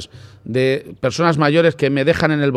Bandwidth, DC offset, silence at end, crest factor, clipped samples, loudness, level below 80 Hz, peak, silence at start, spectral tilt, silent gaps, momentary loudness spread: 12.5 kHz; under 0.1%; 0 s; 16 dB; under 0.1%; -17 LUFS; -50 dBFS; 0 dBFS; 0 s; -6.5 dB/octave; none; 10 LU